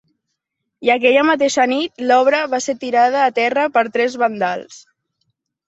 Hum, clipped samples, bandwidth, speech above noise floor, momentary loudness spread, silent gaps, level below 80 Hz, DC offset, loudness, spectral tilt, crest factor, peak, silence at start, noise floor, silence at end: none; under 0.1%; 8.2 kHz; 61 dB; 8 LU; none; -66 dBFS; under 0.1%; -16 LUFS; -3 dB/octave; 16 dB; 0 dBFS; 0.8 s; -77 dBFS; 0.9 s